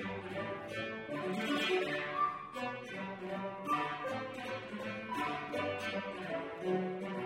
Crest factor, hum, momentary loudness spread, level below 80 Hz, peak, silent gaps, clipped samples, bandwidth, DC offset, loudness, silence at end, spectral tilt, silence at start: 16 dB; none; 7 LU; -74 dBFS; -22 dBFS; none; under 0.1%; 16 kHz; under 0.1%; -38 LUFS; 0 s; -5 dB/octave; 0 s